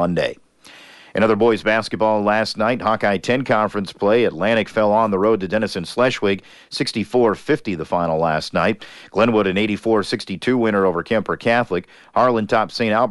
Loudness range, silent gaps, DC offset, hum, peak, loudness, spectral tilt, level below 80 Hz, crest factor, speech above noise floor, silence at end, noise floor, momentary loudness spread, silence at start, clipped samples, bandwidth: 2 LU; none; under 0.1%; none; -4 dBFS; -19 LUFS; -6 dB/octave; -54 dBFS; 14 dB; 27 dB; 0 s; -45 dBFS; 6 LU; 0 s; under 0.1%; 11.5 kHz